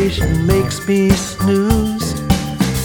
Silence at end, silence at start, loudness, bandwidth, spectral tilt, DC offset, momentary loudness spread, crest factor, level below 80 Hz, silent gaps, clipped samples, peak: 0 s; 0 s; -16 LUFS; over 20 kHz; -5.5 dB/octave; 0.3%; 4 LU; 14 dB; -26 dBFS; none; under 0.1%; 0 dBFS